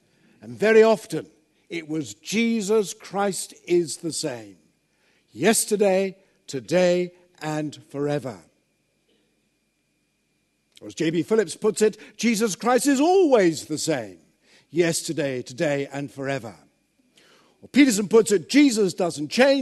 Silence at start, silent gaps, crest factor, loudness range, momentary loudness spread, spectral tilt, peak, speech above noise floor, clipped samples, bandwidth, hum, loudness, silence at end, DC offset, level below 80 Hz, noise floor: 0.45 s; none; 20 dB; 9 LU; 14 LU; -4.5 dB/octave; -2 dBFS; 49 dB; under 0.1%; 13 kHz; none; -22 LUFS; 0 s; under 0.1%; -72 dBFS; -70 dBFS